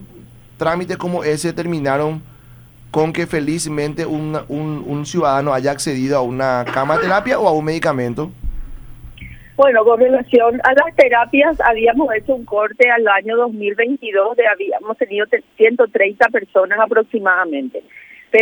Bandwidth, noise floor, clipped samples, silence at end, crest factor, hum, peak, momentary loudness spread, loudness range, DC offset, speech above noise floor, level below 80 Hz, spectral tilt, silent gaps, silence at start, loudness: over 20 kHz; -42 dBFS; under 0.1%; 0 s; 16 dB; none; 0 dBFS; 11 LU; 7 LU; under 0.1%; 27 dB; -40 dBFS; -5.5 dB/octave; none; 0 s; -16 LUFS